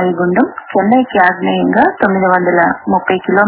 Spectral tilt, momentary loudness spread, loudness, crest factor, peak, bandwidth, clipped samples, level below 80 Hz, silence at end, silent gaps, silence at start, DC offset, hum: -10 dB/octave; 4 LU; -12 LUFS; 12 dB; 0 dBFS; 4 kHz; 0.2%; -50 dBFS; 0 s; none; 0 s; under 0.1%; none